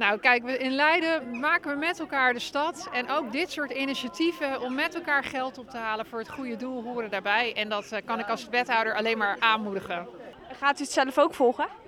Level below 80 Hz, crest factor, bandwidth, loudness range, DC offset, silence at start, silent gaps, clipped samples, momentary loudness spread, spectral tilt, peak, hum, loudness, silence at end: -66 dBFS; 22 dB; 18 kHz; 4 LU; under 0.1%; 0 s; none; under 0.1%; 11 LU; -3 dB/octave; -6 dBFS; none; -27 LUFS; 0.05 s